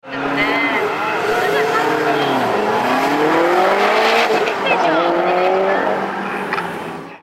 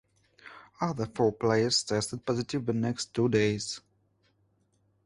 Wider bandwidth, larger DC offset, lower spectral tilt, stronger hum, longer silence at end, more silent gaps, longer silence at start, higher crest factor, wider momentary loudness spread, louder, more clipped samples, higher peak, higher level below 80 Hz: first, 16.5 kHz vs 11.5 kHz; neither; about the same, -4.5 dB/octave vs -4.5 dB/octave; second, none vs 50 Hz at -60 dBFS; second, 0.05 s vs 1.25 s; neither; second, 0.05 s vs 0.45 s; second, 14 dB vs 20 dB; about the same, 7 LU vs 8 LU; first, -16 LUFS vs -29 LUFS; neither; first, -2 dBFS vs -12 dBFS; first, -56 dBFS vs -62 dBFS